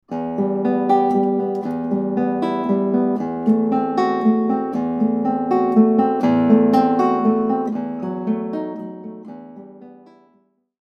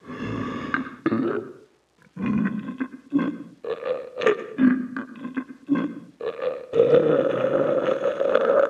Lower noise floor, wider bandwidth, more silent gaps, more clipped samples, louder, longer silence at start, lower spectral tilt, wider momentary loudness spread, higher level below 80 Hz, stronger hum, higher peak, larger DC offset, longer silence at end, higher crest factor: about the same, -61 dBFS vs -59 dBFS; about the same, 6.8 kHz vs 7.4 kHz; neither; neither; first, -19 LUFS vs -25 LUFS; about the same, 0.1 s vs 0.05 s; first, -9 dB/octave vs -7.5 dB/octave; about the same, 12 LU vs 14 LU; about the same, -62 dBFS vs -62 dBFS; neither; about the same, -2 dBFS vs -4 dBFS; neither; first, 0.9 s vs 0 s; about the same, 16 dB vs 20 dB